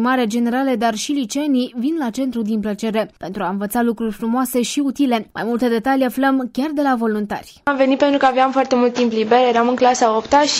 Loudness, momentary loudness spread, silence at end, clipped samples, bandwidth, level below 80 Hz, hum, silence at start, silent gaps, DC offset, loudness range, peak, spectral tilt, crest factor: -18 LUFS; 7 LU; 0 s; under 0.1%; 16 kHz; -54 dBFS; none; 0 s; none; under 0.1%; 5 LU; -2 dBFS; -4 dB/octave; 14 dB